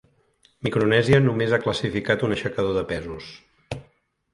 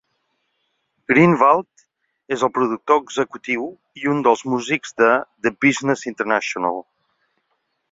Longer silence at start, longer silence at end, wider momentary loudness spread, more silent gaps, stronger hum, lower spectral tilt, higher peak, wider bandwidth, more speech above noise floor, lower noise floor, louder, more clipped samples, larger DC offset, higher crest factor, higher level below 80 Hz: second, 0.65 s vs 1.1 s; second, 0.5 s vs 1.1 s; first, 19 LU vs 10 LU; neither; neither; about the same, -6.5 dB/octave vs -5.5 dB/octave; second, -4 dBFS vs 0 dBFS; first, 11.5 kHz vs 7.8 kHz; second, 40 dB vs 53 dB; second, -62 dBFS vs -71 dBFS; second, -22 LUFS vs -19 LUFS; neither; neither; about the same, 20 dB vs 20 dB; first, -48 dBFS vs -64 dBFS